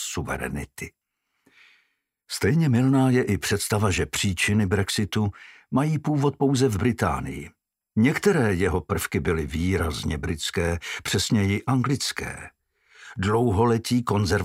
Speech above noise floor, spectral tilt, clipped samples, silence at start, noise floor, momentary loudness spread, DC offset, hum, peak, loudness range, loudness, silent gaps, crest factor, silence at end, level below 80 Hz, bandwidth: 48 dB; -5.5 dB/octave; under 0.1%; 0 s; -71 dBFS; 11 LU; under 0.1%; none; -6 dBFS; 3 LU; -24 LUFS; none; 18 dB; 0 s; -42 dBFS; 16 kHz